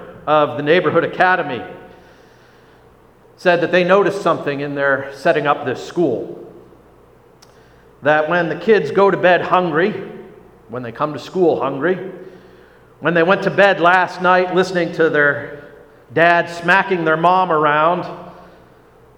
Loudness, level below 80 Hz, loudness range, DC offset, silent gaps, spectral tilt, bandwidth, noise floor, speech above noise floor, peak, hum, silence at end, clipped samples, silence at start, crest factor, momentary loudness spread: -16 LUFS; -58 dBFS; 6 LU; under 0.1%; none; -6 dB/octave; 11.5 kHz; -48 dBFS; 32 dB; 0 dBFS; none; 0.75 s; under 0.1%; 0 s; 18 dB; 15 LU